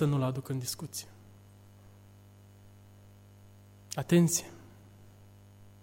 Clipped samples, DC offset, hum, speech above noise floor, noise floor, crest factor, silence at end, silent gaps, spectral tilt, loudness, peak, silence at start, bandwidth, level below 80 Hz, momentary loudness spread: under 0.1%; under 0.1%; 50 Hz at -55 dBFS; 26 dB; -56 dBFS; 20 dB; 1.15 s; none; -5.5 dB/octave; -31 LUFS; -14 dBFS; 0 s; 16.5 kHz; -66 dBFS; 26 LU